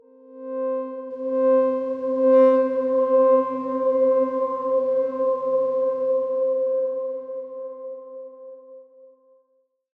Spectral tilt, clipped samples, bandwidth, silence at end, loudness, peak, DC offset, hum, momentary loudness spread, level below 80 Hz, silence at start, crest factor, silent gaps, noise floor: -8 dB/octave; under 0.1%; 3.8 kHz; 1.2 s; -21 LUFS; -6 dBFS; under 0.1%; none; 18 LU; -78 dBFS; 0.3 s; 16 dB; none; -68 dBFS